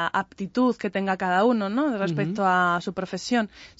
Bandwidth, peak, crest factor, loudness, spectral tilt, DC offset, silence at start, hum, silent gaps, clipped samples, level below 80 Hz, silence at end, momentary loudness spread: 8 kHz; -10 dBFS; 16 dB; -24 LUFS; -6 dB/octave; under 0.1%; 0 s; none; none; under 0.1%; -62 dBFS; 0.1 s; 7 LU